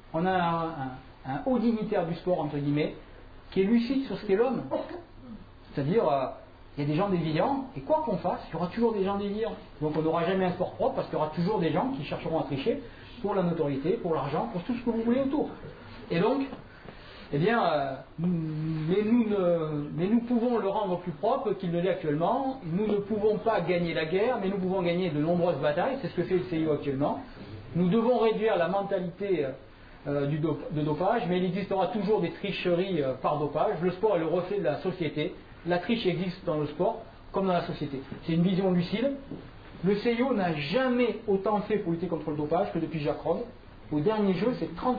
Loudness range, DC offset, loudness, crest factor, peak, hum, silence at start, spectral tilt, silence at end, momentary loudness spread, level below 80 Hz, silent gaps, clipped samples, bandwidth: 2 LU; under 0.1%; -29 LUFS; 14 dB; -14 dBFS; none; 0.05 s; -9.5 dB/octave; 0 s; 9 LU; -54 dBFS; none; under 0.1%; 5 kHz